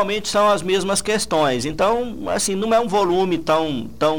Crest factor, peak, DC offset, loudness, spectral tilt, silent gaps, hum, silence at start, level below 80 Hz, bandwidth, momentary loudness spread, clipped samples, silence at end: 14 dB; -6 dBFS; 1%; -19 LUFS; -4 dB/octave; none; none; 0 s; -44 dBFS; 19.5 kHz; 4 LU; under 0.1%; 0 s